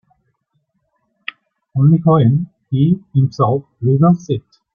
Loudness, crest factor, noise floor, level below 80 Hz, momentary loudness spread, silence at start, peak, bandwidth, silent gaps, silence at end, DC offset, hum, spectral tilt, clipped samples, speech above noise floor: -15 LUFS; 14 dB; -67 dBFS; -54 dBFS; 17 LU; 1.75 s; -2 dBFS; 6.8 kHz; none; 0.35 s; under 0.1%; none; -9.5 dB/octave; under 0.1%; 54 dB